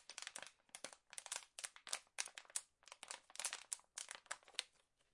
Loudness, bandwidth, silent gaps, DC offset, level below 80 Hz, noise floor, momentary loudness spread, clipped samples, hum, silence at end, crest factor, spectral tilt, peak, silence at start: -49 LUFS; 12 kHz; none; under 0.1%; under -90 dBFS; -75 dBFS; 9 LU; under 0.1%; none; 0.45 s; 36 dB; 2.5 dB/octave; -18 dBFS; 0 s